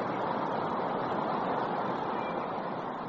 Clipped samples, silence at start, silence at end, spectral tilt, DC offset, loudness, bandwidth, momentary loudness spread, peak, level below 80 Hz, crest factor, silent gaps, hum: under 0.1%; 0 s; 0 s; -4.5 dB/octave; under 0.1%; -33 LUFS; 7.6 kHz; 3 LU; -20 dBFS; -68 dBFS; 12 dB; none; none